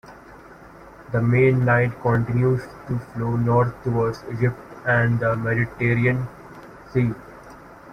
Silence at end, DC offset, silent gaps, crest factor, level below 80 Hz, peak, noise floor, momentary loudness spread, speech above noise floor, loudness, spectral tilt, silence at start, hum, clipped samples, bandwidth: 0 s; under 0.1%; none; 16 dB; -48 dBFS; -6 dBFS; -44 dBFS; 14 LU; 24 dB; -22 LUFS; -9 dB/octave; 0.05 s; none; under 0.1%; 6.4 kHz